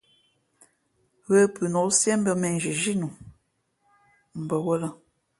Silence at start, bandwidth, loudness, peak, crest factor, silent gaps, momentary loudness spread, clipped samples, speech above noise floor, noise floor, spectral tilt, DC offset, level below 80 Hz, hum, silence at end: 1.3 s; 11.5 kHz; -24 LUFS; -8 dBFS; 20 dB; none; 15 LU; under 0.1%; 48 dB; -72 dBFS; -4.5 dB/octave; under 0.1%; -66 dBFS; none; 0.45 s